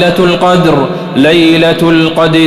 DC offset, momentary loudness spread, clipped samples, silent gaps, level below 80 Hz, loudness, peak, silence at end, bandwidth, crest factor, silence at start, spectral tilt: under 0.1%; 4 LU; 0.7%; none; -38 dBFS; -8 LUFS; 0 dBFS; 0 s; 14 kHz; 8 dB; 0 s; -6 dB/octave